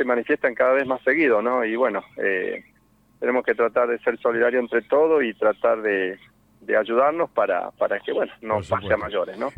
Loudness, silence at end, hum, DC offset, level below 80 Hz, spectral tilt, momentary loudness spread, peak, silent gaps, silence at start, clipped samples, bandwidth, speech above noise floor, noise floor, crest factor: -22 LUFS; 0.05 s; none; under 0.1%; -60 dBFS; -7 dB/octave; 7 LU; -8 dBFS; none; 0 s; under 0.1%; 8.4 kHz; 35 dB; -57 dBFS; 16 dB